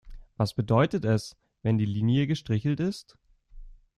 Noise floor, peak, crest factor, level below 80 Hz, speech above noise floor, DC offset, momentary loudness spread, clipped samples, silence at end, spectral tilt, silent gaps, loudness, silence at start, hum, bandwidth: -47 dBFS; -8 dBFS; 20 dB; -52 dBFS; 21 dB; under 0.1%; 8 LU; under 0.1%; 0.25 s; -7.5 dB/octave; none; -27 LUFS; 0.05 s; none; 12 kHz